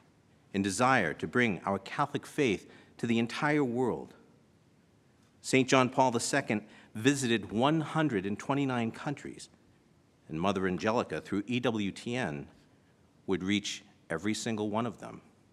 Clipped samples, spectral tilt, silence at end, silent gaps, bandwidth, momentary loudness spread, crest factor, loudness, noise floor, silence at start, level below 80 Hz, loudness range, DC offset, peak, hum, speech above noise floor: under 0.1%; -5 dB/octave; 0.35 s; none; 14 kHz; 14 LU; 24 dB; -31 LUFS; -65 dBFS; 0.55 s; -68 dBFS; 5 LU; under 0.1%; -8 dBFS; none; 34 dB